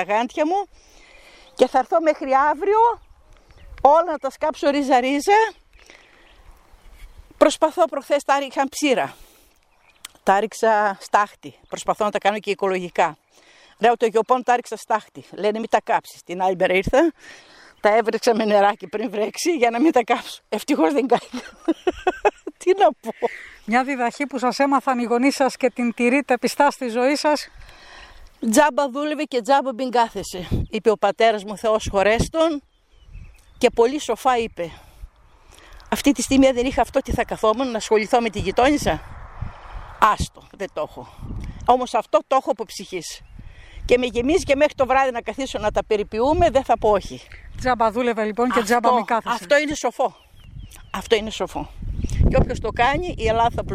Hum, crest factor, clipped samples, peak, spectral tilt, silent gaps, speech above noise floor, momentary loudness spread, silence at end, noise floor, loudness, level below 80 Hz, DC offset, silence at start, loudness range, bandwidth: none; 20 dB; under 0.1%; 0 dBFS; -4.5 dB/octave; none; 38 dB; 12 LU; 0 s; -58 dBFS; -20 LUFS; -38 dBFS; under 0.1%; 0 s; 3 LU; 15.5 kHz